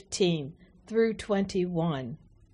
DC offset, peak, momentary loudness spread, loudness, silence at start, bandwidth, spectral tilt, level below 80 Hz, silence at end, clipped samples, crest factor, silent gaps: under 0.1%; -14 dBFS; 14 LU; -29 LUFS; 0.1 s; 10.5 kHz; -5.5 dB/octave; -58 dBFS; 0.4 s; under 0.1%; 16 dB; none